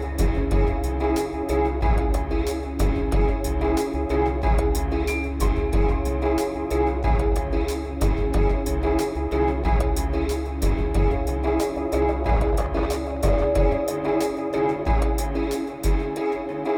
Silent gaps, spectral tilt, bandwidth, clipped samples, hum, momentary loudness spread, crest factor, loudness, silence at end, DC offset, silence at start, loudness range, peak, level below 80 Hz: none; -7 dB/octave; 18.5 kHz; under 0.1%; none; 3 LU; 12 dB; -24 LUFS; 0 s; under 0.1%; 0 s; 1 LU; -8 dBFS; -24 dBFS